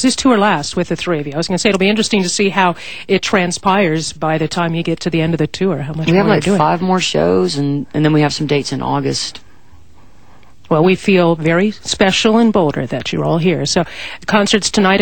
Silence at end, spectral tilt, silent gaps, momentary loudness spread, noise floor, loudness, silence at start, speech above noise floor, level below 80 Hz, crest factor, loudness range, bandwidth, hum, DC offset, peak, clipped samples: 0 s; -5 dB/octave; none; 7 LU; -46 dBFS; -15 LUFS; 0 s; 32 dB; -44 dBFS; 14 dB; 3 LU; 18 kHz; none; 2%; 0 dBFS; under 0.1%